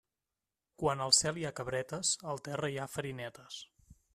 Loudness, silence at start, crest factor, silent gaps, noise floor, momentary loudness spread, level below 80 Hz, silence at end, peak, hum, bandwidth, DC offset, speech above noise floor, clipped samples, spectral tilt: -33 LUFS; 0.8 s; 26 dB; none; under -90 dBFS; 17 LU; -66 dBFS; 0.2 s; -10 dBFS; none; 14.5 kHz; under 0.1%; over 55 dB; under 0.1%; -2.5 dB/octave